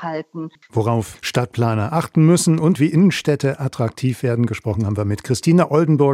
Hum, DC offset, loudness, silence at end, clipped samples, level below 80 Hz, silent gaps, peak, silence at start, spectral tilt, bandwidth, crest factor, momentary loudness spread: none; under 0.1%; -18 LUFS; 0 s; under 0.1%; -56 dBFS; none; -2 dBFS; 0 s; -6.5 dB/octave; 15 kHz; 14 dB; 8 LU